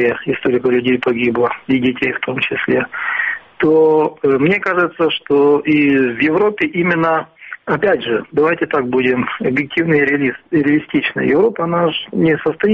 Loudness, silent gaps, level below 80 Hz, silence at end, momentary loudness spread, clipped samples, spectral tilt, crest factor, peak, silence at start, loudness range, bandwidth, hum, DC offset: -15 LUFS; none; -54 dBFS; 0 s; 5 LU; under 0.1%; -8 dB/octave; 12 dB; -4 dBFS; 0 s; 2 LU; 5.6 kHz; none; under 0.1%